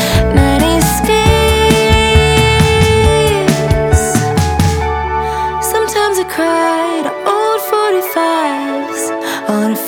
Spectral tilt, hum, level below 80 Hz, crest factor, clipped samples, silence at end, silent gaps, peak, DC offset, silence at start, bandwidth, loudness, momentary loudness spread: -5 dB/octave; none; -22 dBFS; 12 dB; under 0.1%; 0 s; none; 0 dBFS; under 0.1%; 0 s; 18.5 kHz; -12 LUFS; 7 LU